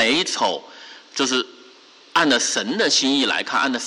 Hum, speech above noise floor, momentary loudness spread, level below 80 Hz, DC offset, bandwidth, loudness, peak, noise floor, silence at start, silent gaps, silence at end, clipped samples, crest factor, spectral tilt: none; 28 dB; 15 LU; -66 dBFS; under 0.1%; 11.5 kHz; -19 LUFS; -8 dBFS; -48 dBFS; 0 s; none; 0 s; under 0.1%; 14 dB; -1.5 dB/octave